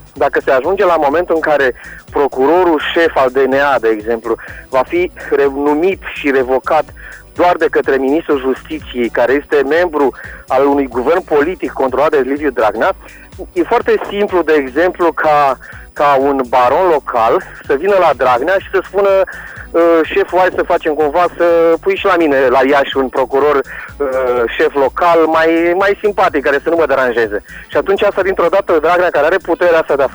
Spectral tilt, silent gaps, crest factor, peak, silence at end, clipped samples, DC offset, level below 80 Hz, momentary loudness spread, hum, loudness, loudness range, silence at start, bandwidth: -5.5 dB/octave; none; 8 dB; -4 dBFS; 0 s; under 0.1%; under 0.1%; -40 dBFS; 7 LU; none; -13 LUFS; 2 LU; 0.15 s; over 20 kHz